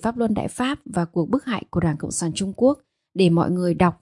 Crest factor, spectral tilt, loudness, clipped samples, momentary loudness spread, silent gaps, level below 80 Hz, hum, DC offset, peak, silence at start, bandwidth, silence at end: 18 dB; -6 dB/octave; -22 LUFS; under 0.1%; 7 LU; none; -50 dBFS; none; under 0.1%; -4 dBFS; 0 s; 11.5 kHz; 0.1 s